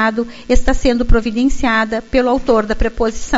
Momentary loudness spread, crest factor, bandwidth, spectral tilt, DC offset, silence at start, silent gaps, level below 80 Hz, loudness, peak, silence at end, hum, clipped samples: 4 LU; 14 dB; 8 kHz; -4 dB/octave; under 0.1%; 0 s; none; -20 dBFS; -16 LUFS; 0 dBFS; 0 s; none; under 0.1%